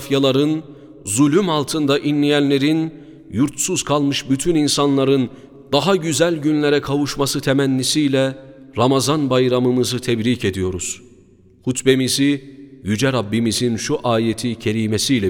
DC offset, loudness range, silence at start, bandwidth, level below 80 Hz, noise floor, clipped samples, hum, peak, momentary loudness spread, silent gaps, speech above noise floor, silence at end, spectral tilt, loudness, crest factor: under 0.1%; 2 LU; 0 s; 17 kHz; -50 dBFS; -49 dBFS; under 0.1%; none; 0 dBFS; 8 LU; none; 32 dB; 0 s; -4.5 dB/octave; -18 LUFS; 18 dB